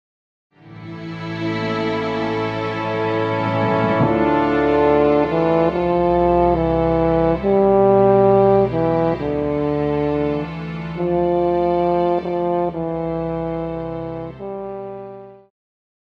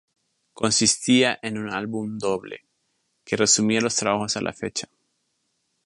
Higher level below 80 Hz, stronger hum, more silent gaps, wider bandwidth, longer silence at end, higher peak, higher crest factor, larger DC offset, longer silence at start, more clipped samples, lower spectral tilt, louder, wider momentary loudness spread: first, -40 dBFS vs -62 dBFS; neither; neither; second, 7 kHz vs 11.5 kHz; second, 0.7 s vs 1 s; about the same, -2 dBFS vs -4 dBFS; second, 16 dB vs 22 dB; neither; about the same, 0.65 s vs 0.6 s; neither; first, -9 dB/octave vs -2.5 dB/octave; first, -18 LUFS vs -22 LUFS; first, 15 LU vs 12 LU